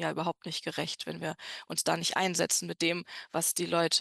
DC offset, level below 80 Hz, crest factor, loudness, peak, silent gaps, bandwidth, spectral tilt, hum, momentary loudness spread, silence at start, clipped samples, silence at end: under 0.1%; -76 dBFS; 20 dB; -31 LUFS; -12 dBFS; none; 13 kHz; -2.5 dB/octave; none; 9 LU; 0 s; under 0.1%; 0 s